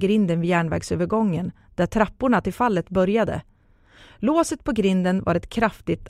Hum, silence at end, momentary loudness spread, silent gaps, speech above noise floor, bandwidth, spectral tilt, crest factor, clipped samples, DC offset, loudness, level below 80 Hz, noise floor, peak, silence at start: none; 0 s; 6 LU; none; 32 dB; 14 kHz; -6.5 dB/octave; 18 dB; under 0.1%; under 0.1%; -22 LUFS; -44 dBFS; -54 dBFS; -4 dBFS; 0 s